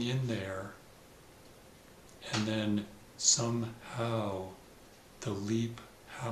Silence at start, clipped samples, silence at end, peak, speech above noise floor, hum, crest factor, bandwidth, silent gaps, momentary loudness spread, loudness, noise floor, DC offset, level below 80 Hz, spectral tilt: 0 s; under 0.1%; 0 s; -12 dBFS; 23 dB; none; 24 dB; 14.5 kHz; none; 21 LU; -34 LUFS; -56 dBFS; under 0.1%; -66 dBFS; -3.5 dB/octave